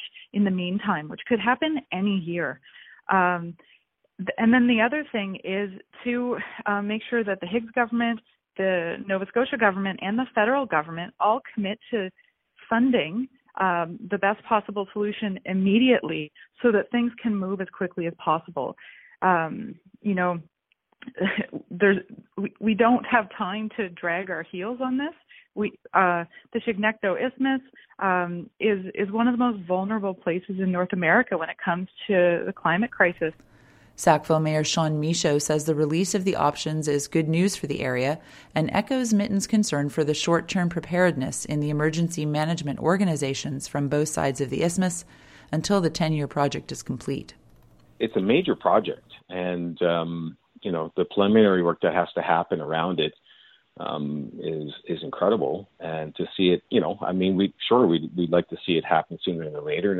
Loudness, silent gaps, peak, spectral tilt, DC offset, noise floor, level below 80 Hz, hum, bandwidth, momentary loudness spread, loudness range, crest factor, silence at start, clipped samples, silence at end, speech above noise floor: -25 LUFS; none; -4 dBFS; -5.5 dB/octave; under 0.1%; -69 dBFS; -60 dBFS; none; 14.5 kHz; 11 LU; 4 LU; 20 dB; 0 s; under 0.1%; 0 s; 44 dB